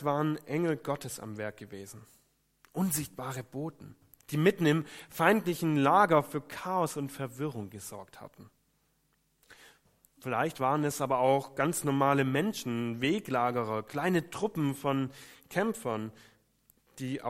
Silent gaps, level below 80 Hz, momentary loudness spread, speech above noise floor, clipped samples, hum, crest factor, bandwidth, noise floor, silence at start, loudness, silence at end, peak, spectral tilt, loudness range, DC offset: none; -70 dBFS; 16 LU; 43 dB; under 0.1%; none; 24 dB; 16 kHz; -73 dBFS; 0 s; -31 LUFS; 0 s; -8 dBFS; -5.5 dB/octave; 10 LU; under 0.1%